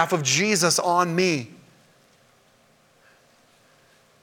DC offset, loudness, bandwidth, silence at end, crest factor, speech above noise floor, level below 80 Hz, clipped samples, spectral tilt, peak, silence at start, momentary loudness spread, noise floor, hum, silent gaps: under 0.1%; -21 LUFS; 19 kHz; 2.75 s; 22 dB; 38 dB; -74 dBFS; under 0.1%; -3 dB/octave; -4 dBFS; 0 s; 8 LU; -59 dBFS; none; none